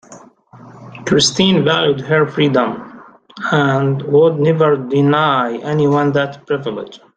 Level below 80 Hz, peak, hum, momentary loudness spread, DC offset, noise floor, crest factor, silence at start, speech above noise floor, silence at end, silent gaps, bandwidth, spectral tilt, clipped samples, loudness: -54 dBFS; 0 dBFS; none; 9 LU; under 0.1%; -42 dBFS; 14 dB; 0.1 s; 27 dB; 0.2 s; none; 9.4 kHz; -5 dB/octave; under 0.1%; -14 LUFS